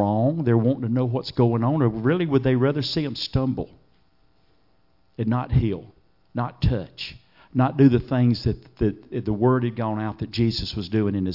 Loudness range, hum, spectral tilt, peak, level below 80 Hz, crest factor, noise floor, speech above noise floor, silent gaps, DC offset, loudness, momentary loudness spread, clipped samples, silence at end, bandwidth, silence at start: 6 LU; none; -8.5 dB/octave; -4 dBFS; -42 dBFS; 18 dB; -65 dBFS; 43 dB; none; under 0.1%; -23 LUFS; 10 LU; under 0.1%; 0 s; 5.8 kHz; 0 s